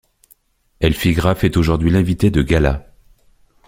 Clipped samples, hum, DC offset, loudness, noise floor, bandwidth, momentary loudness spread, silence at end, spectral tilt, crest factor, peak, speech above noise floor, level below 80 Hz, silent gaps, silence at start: under 0.1%; none; under 0.1%; -16 LUFS; -55 dBFS; 16.5 kHz; 4 LU; 0.85 s; -7 dB/octave; 16 dB; -2 dBFS; 41 dB; -28 dBFS; none; 0.8 s